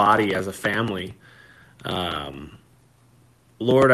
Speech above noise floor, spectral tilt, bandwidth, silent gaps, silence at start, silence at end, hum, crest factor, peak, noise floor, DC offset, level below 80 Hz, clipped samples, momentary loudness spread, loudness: 35 dB; -5.5 dB/octave; 13.5 kHz; none; 0 s; 0 s; none; 18 dB; -4 dBFS; -57 dBFS; under 0.1%; -56 dBFS; under 0.1%; 18 LU; -24 LUFS